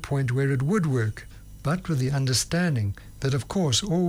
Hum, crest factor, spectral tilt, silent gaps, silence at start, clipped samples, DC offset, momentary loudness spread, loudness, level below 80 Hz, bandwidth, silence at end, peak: none; 12 dB; -5 dB/octave; none; 0 s; under 0.1%; under 0.1%; 8 LU; -25 LUFS; -46 dBFS; 19.5 kHz; 0 s; -12 dBFS